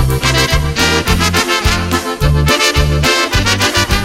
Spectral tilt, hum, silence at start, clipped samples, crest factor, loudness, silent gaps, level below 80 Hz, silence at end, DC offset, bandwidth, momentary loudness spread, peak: -3.5 dB/octave; none; 0 s; under 0.1%; 12 dB; -12 LUFS; none; -20 dBFS; 0 s; under 0.1%; 16.5 kHz; 3 LU; 0 dBFS